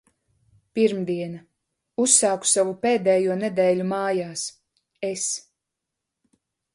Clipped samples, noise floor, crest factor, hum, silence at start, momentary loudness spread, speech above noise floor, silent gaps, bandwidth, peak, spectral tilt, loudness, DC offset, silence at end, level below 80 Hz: under 0.1%; -84 dBFS; 22 dB; none; 0.75 s; 16 LU; 61 dB; none; 11.5 kHz; -2 dBFS; -3.5 dB/octave; -22 LUFS; under 0.1%; 1.35 s; -70 dBFS